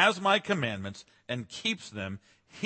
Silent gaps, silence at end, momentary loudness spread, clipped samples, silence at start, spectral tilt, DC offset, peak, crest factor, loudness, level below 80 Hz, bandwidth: none; 0 s; 16 LU; under 0.1%; 0 s; -4 dB/octave; under 0.1%; -8 dBFS; 24 dB; -30 LUFS; -70 dBFS; 8.8 kHz